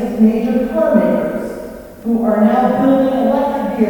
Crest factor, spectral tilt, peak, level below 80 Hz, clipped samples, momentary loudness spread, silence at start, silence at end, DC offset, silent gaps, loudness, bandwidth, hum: 14 dB; -8 dB/octave; 0 dBFS; -42 dBFS; under 0.1%; 12 LU; 0 s; 0 s; under 0.1%; none; -14 LUFS; 19 kHz; none